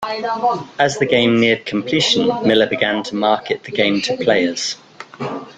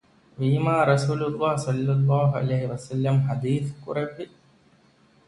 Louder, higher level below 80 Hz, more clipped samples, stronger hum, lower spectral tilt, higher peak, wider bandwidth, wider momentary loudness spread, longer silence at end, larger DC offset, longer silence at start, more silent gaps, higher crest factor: first, -17 LUFS vs -24 LUFS; about the same, -56 dBFS vs -60 dBFS; neither; neither; second, -4 dB/octave vs -7.5 dB/octave; first, -2 dBFS vs -6 dBFS; second, 9.4 kHz vs 11.5 kHz; about the same, 9 LU vs 9 LU; second, 0.05 s vs 1.05 s; neither; second, 0 s vs 0.4 s; neither; about the same, 16 dB vs 18 dB